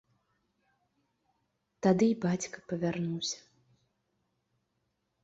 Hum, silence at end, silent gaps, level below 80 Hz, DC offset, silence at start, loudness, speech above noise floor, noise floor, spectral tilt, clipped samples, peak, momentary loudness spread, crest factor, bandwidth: none; 1.85 s; none; -72 dBFS; under 0.1%; 1.85 s; -31 LUFS; 50 dB; -80 dBFS; -5.5 dB/octave; under 0.1%; -14 dBFS; 10 LU; 22 dB; 8 kHz